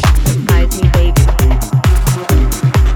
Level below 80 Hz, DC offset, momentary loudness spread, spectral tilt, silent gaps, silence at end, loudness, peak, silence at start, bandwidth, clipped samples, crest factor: -12 dBFS; under 0.1%; 2 LU; -5.5 dB/octave; none; 0 s; -12 LUFS; 0 dBFS; 0 s; 19.5 kHz; under 0.1%; 10 dB